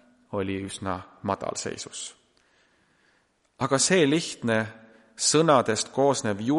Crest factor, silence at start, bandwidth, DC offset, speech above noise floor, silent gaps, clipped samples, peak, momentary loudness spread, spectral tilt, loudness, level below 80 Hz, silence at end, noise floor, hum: 22 dB; 0.3 s; 11.5 kHz; under 0.1%; 42 dB; none; under 0.1%; -6 dBFS; 15 LU; -3.5 dB/octave; -25 LUFS; -66 dBFS; 0 s; -67 dBFS; none